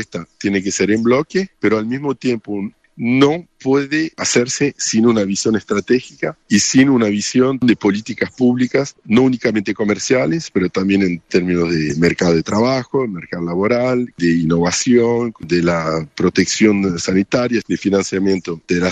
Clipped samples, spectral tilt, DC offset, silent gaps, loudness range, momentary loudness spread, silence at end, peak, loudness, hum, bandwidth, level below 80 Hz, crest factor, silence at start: under 0.1%; -5 dB/octave; under 0.1%; none; 2 LU; 7 LU; 0 s; -2 dBFS; -16 LUFS; none; 9.4 kHz; -50 dBFS; 14 dB; 0 s